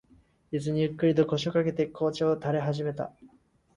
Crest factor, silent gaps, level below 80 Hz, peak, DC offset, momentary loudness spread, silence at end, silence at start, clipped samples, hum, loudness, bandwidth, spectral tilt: 16 dB; none; -62 dBFS; -12 dBFS; under 0.1%; 9 LU; 0.5 s; 0.5 s; under 0.1%; none; -28 LUFS; 10.5 kHz; -7 dB/octave